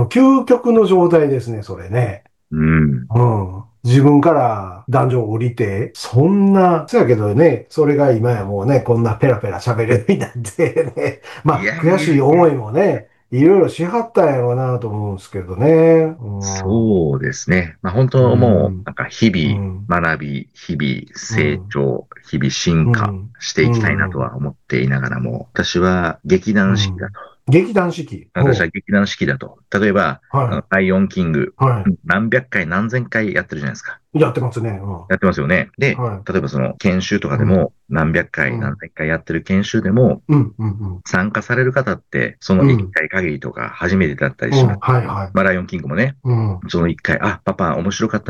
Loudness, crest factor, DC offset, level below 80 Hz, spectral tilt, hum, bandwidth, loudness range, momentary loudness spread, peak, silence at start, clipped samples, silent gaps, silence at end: -16 LUFS; 14 dB; 0.1%; -42 dBFS; -7 dB/octave; none; 11.5 kHz; 4 LU; 11 LU; -2 dBFS; 0 s; under 0.1%; none; 0 s